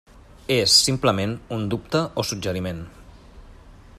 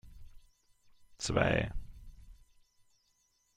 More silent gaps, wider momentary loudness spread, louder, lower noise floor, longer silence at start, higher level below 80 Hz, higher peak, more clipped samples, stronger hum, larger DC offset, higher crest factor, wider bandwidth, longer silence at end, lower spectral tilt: neither; second, 18 LU vs 21 LU; first, -21 LUFS vs -33 LUFS; second, -45 dBFS vs -75 dBFS; about the same, 0.15 s vs 0.05 s; about the same, -48 dBFS vs -50 dBFS; first, -2 dBFS vs -12 dBFS; neither; neither; neither; about the same, 22 dB vs 26 dB; about the same, 14.5 kHz vs 15.5 kHz; second, 0 s vs 1.25 s; second, -3.5 dB/octave vs -5 dB/octave